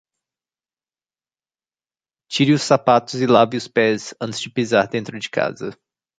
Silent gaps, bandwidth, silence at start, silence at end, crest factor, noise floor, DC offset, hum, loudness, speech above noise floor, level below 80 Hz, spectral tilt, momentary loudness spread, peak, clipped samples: none; 9.4 kHz; 2.3 s; 0.45 s; 20 dB; under -90 dBFS; under 0.1%; none; -19 LUFS; over 72 dB; -62 dBFS; -5 dB/octave; 11 LU; -2 dBFS; under 0.1%